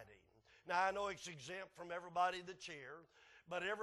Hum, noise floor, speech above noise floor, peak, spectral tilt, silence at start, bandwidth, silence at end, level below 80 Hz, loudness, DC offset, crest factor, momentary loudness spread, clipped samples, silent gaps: none; -71 dBFS; 27 dB; -24 dBFS; -3 dB/octave; 0 s; 12 kHz; 0 s; -78 dBFS; -43 LUFS; under 0.1%; 20 dB; 18 LU; under 0.1%; none